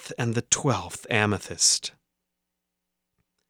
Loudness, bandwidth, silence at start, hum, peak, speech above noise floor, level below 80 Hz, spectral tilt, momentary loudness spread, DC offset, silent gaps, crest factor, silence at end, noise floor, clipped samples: -24 LUFS; 17 kHz; 0 s; none; -2 dBFS; 57 dB; -62 dBFS; -2.5 dB/octave; 8 LU; under 0.1%; none; 26 dB; 1.6 s; -82 dBFS; under 0.1%